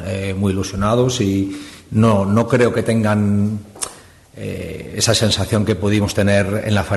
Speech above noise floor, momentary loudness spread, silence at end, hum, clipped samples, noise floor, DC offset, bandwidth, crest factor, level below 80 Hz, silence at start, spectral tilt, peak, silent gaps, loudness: 25 dB; 13 LU; 0 s; none; under 0.1%; -42 dBFS; under 0.1%; 12.5 kHz; 16 dB; -44 dBFS; 0 s; -5.5 dB/octave; -2 dBFS; none; -17 LUFS